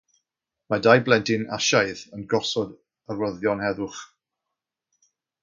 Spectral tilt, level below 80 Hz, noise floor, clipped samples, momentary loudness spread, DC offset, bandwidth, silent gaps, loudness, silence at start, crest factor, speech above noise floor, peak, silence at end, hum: -4 dB/octave; -62 dBFS; -85 dBFS; under 0.1%; 16 LU; under 0.1%; 7.6 kHz; none; -23 LUFS; 0.7 s; 24 dB; 62 dB; -2 dBFS; 1.35 s; none